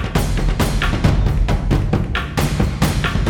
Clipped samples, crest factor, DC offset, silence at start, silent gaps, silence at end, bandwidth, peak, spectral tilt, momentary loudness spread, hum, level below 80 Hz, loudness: under 0.1%; 14 dB; under 0.1%; 0 s; none; 0 s; 18 kHz; -2 dBFS; -6 dB/octave; 3 LU; none; -20 dBFS; -19 LUFS